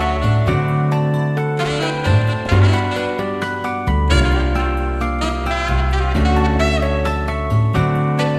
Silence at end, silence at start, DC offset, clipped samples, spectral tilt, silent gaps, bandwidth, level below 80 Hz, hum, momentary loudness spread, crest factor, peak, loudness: 0 s; 0 s; under 0.1%; under 0.1%; -6.5 dB/octave; none; 12.5 kHz; -22 dBFS; none; 6 LU; 14 dB; -2 dBFS; -18 LUFS